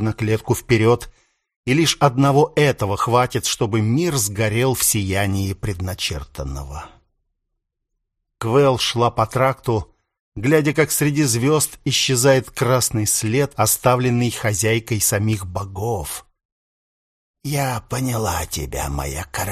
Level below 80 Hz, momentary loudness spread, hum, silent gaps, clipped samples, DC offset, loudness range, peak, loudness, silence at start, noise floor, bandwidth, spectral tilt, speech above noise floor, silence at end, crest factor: -40 dBFS; 10 LU; none; 1.56-1.63 s, 10.20-10.32 s, 16.45-17.34 s; under 0.1%; under 0.1%; 8 LU; 0 dBFS; -19 LUFS; 0 s; -76 dBFS; 15.5 kHz; -4.5 dB/octave; 58 dB; 0 s; 20 dB